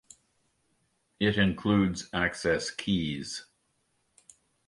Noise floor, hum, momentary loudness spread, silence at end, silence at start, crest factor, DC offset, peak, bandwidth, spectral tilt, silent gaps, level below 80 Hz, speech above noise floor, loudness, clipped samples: -74 dBFS; none; 10 LU; 1.25 s; 1.2 s; 20 dB; under 0.1%; -12 dBFS; 11.5 kHz; -5 dB/octave; none; -52 dBFS; 46 dB; -28 LUFS; under 0.1%